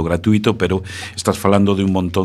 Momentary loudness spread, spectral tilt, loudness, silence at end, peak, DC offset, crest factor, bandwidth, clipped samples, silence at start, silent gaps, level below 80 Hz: 7 LU; -6 dB/octave; -17 LUFS; 0 s; 0 dBFS; under 0.1%; 16 dB; 13.5 kHz; under 0.1%; 0 s; none; -40 dBFS